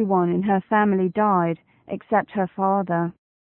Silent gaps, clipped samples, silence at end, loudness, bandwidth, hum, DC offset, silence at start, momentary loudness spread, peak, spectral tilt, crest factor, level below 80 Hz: none; under 0.1%; 0.4 s; -22 LUFS; 3.9 kHz; none; under 0.1%; 0 s; 11 LU; -8 dBFS; -12.5 dB/octave; 14 dB; -64 dBFS